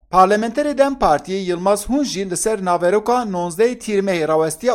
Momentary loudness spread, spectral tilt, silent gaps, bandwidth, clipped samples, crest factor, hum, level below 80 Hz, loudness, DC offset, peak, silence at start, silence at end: 5 LU; -4.5 dB/octave; none; 16.5 kHz; under 0.1%; 16 dB; none; -44 dBFS; -18 LUFS; under 0.1%; 0 dBFS; 0.1 s; 0 s